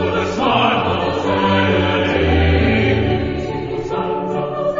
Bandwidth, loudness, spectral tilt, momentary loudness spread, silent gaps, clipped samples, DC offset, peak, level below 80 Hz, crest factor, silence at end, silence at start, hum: 7.6 kHz; -17 LUFS; -7 dB/octave; 7 LU; none; under 0.1%; under 0.1%; -2 dBFS; -30 dBFS; 14 dB; 0 s; 0 s; none